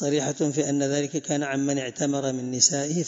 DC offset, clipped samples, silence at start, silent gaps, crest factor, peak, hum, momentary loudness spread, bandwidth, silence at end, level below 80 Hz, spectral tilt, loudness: under 0.1%; under 0.1%; 0 s; none; 20 dB; -6 dBFS; none; 7 LU; 7.8 kHz; 0 s; -72 dBFS; -3.5 dB/octave; -24 LUFS